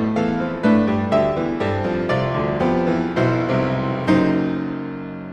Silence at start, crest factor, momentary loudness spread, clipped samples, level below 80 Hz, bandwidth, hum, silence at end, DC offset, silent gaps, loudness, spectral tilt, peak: 0 s; 14 dB; 6 LU; under 0.1%; -44 dBFS; 9.2 kHz; none; 0 s; under 0.1%; none; -20 LUFS; -8 dB/octave; -4 dBFS